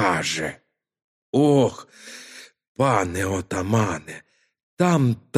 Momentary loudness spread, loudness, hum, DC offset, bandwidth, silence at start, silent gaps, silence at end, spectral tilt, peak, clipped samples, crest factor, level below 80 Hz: 22 LU; -22 LUFS; none; under 0.1%; 15 kHz; 0 s; 1.04-1.33 s, 2.68-2.75 s, 4.63-4.77 s; 0 s; -5.5 dB/octave; -4 dBFS; under 0.1%; 20 dB; -56 dBFS